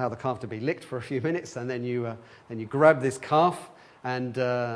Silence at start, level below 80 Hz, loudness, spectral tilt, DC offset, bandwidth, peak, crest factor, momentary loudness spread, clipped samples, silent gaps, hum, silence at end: 0 s; -70 dBFS; -27 LUFS; -6.5 dB/octave; under 0.1%; 11 kHz; -4 dBFS; 22 dB; 17 LU; under 0.1%; none; none; 0 s